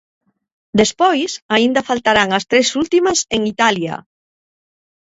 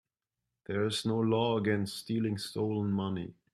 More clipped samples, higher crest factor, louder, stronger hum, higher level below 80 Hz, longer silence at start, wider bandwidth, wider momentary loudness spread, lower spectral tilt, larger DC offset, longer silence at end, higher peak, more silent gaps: neither; about the same, 18 dB vs 16 dB; first, -15 LUFS vs -32 LUFS; neither; first, -52 dBFS vs -68 dBFS; about the same, 0.75 s vs 0.7 s; second, 8 kHz vs 14 kHz; about the same, 6 LU vs 8 LU; second, -3 dB/octave vs -6 dB/octave; neither; first, 1.15 s vs 0.25 s; first, 0 dBFS vs -16 dBFS; first, 1.42-1.49 s vs none